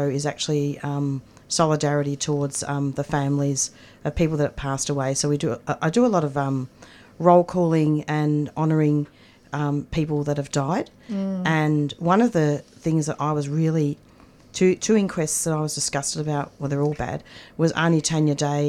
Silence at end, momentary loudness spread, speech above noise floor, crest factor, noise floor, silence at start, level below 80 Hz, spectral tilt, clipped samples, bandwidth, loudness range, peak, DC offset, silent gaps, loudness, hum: 0 s; 8 LU; 27 dB; 20 dB; -50 dBFS; 0 s; -48 dBFS; -5.5 dB/octave; under 0.1%; 14 kHz; 3 LU; -4 dBFS; under 0.1%; none; -23 LUFS; none